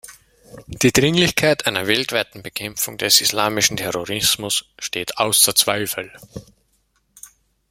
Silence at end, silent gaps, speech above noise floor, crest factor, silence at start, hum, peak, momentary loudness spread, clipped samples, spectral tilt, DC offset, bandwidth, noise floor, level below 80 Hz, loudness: 0.45 s; none; 45 dB; 20 dB; 0.05 s; none; 0 dBFS; 14 LU; under 0.1%; -2 dB/octave; under 0.1%; 16.5 kHz; -65 dBFS; -50 dBFS; -18 LUFS